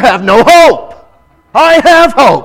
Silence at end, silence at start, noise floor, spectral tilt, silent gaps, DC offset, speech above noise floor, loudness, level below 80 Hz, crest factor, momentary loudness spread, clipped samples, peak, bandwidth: 0 s; 0 s; -45 dBFS; -3.5 dB/octave; none; under 0.1%; 40 dB; -5 LUFS; -34 dBFS; 6 dB; 8 LU; 6%; 0 dBFS; 18.5 kHz